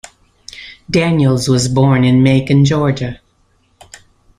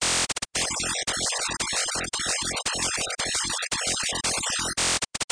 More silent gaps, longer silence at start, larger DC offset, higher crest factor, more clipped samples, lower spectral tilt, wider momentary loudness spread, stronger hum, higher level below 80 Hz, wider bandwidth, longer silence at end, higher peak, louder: neither; first, 0.55 s vs 0 s; neither; about the same, 12 dB vs 16 dB; neither; first, -6.5 dB/octave vs -0.5 dB/octave; first, 21 LU vs 3 LU; neither; first, -42 dBFS vs -50 dBFS; first, 12 kHz vs 10.5 kHz; first, 1.25 s vs 0.05 s; first, -2 dBFS vs -12 dBFS; first, -13 LUFS vs -25 LUFS